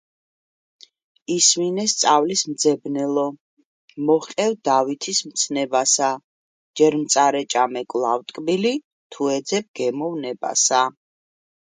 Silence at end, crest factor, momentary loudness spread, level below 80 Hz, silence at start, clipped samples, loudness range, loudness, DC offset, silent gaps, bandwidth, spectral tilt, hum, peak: 0.9 s; 20 dB; 10 LU; -72 dBFS; 1.3 s; under 0.1%; 3 LU; -20 LUFS; under 0.1%; 3.40-3.57 s, 3.65-3.88 s, 6.24-6.74 s, 8.84-9.10 s, 9.68-9.74 s; 9.8 kHz; -2.5 dB/octave; none; -2 dBFS